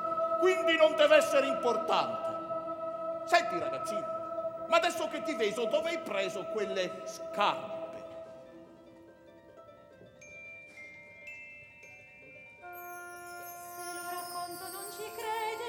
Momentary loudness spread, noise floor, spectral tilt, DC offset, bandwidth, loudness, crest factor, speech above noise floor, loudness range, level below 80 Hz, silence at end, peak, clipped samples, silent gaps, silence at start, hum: 22 LU; -56 dBFS; -3 dB/octave; under 0.1%; 19 kHz; -31 LUFS; 24 dB; 26 dB; 21 LU; -74 dBFS; 0 s; -10 dBFS; under 0.1%; none; 0 s; none